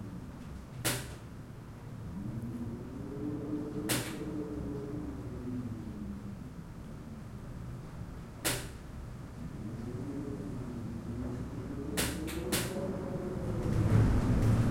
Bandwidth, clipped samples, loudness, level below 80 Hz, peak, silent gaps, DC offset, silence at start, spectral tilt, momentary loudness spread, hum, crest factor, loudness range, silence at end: 16.5 kHz; under 0.1%; -37 LUFS; -44 dBFS; -14 dBFS; none; under 0.1%; 0 s; -5.5 dB/octave; 16 LU; none; 20 dB; 8 LU; 0 s